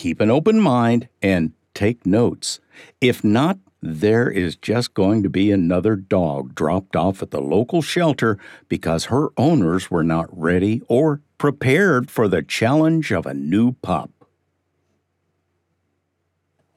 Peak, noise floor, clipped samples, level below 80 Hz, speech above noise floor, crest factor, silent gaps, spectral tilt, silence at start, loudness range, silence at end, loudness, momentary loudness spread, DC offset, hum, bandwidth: -4 dBFS; -72 dBFS; under 0.1%; -50 dBFS; 54 dB; 16 dB; none; -6.5 dB/octave; 0 s; 3 LU; 2.7 s; -19 LUFS; 8 LU; under 0.1%; none; 15 kHz